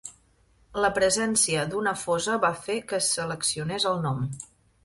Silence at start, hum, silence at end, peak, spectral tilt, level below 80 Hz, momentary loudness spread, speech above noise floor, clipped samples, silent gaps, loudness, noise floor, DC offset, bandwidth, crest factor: 0.05 s; none; 0.4 s; -8 dBFS; -3 dB/octave; -56 dBFS; 12 LU; 36 dB; under 0.1%; none; -25 LUFS; -62 dBFS; under 0.1%; 12 kHz; 18 dB